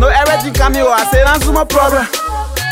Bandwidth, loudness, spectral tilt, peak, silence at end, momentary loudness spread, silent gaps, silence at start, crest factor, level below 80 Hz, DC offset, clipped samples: 16.5 kHz; -12 LUFS; -4 dB/octave; 0 dBFS; 0 s; 7 LU; none; 0 s; 10 dB; -18 dBFS; under 0.1%; under 0.1%